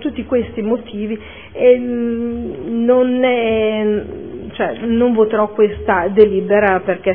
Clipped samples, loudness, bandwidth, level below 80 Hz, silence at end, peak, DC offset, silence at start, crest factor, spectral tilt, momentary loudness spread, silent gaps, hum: under 0.1%; -16 LUFS; 3.6 kHz; -42 dBFS; 0 s; 0 dBFS; 0.5%; 0 s; 16 dB; -10.5 dB/octave; 12 LU; none; none